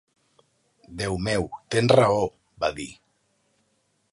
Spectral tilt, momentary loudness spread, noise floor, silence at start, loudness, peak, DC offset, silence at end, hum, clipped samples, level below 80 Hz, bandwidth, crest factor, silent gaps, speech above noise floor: -5.5 dB/octave; 18 LU; -70 dBFS; 0.9 s; -24 LUFS; -2 dBFS; under 0.1%; 1.2 s; none; under 0.1%; -50 dBFS; 11.5 kHz; 24 dB; none; 47 dB